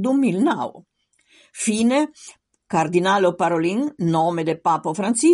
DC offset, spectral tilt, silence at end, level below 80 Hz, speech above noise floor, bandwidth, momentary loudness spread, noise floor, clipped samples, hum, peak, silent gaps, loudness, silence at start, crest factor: under 0.1%; -5 dB/octave; 0 s; -64 dBFS; 39 dB; 11.5 kHz; 7 LU; -58 dBFS; under 0.1%; none; -6 dBFS; none; -20 LUFS; 0 s; 14 dB